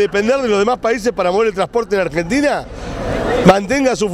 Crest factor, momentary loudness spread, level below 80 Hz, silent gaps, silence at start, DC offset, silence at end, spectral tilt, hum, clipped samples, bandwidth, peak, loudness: 16 dB; 9 LU; -34 dBFS; none; 0 s; under 0.1%; 0 s; -5.5 dB/octave; none; under 0.1%; 15.5 kHz; 0 dBFS; -16 LUFS